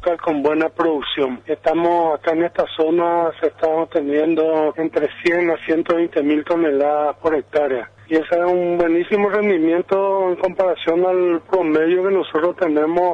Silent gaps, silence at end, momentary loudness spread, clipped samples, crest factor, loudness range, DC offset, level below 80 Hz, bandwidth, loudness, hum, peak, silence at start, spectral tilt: none; 0 s; 4 LU; under 0.1%; 12 dB; 1 LU; under 0.1%; -56 dBFS; 6.6 kHz; -18 LUFS; none; -6 dBFS; 0 s; -7 dB/octave